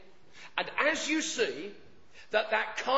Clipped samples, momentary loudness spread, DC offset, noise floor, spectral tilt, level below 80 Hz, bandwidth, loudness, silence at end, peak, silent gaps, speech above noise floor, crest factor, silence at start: under 0.1%; 13 LU; 0.3%; -54 dBFS; -1.5 dB/octave; -70 dBFS; 8 kHz; -30 LUFS; 0 s; -12 dBFS; none; 24 dB; 20 dB; 0.35 s